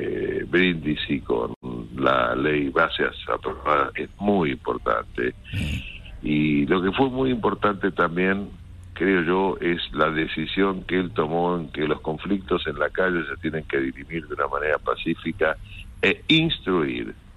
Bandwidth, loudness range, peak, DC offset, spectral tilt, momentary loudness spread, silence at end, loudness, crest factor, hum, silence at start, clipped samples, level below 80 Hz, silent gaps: 12 kHz; 3 LU; -6 dBFS; under 0.1%; -7 dB/octave; 8 LU; 0.05 s; -24 LUFS; 18 dB; none; 0 s; under 0.1%; -44 dBFS; 1.56-1.61 s